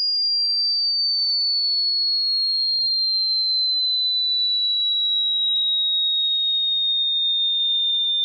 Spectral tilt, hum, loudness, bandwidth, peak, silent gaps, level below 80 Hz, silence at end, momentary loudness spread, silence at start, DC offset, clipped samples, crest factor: 2.5 dB/octave; none; -18 LUFS; 5.2 kHz; -16 dBFS; none; under -90 dBFS; 0 s; 0 LU; 0 s; under 0.1%; under 0.1%; 4 dB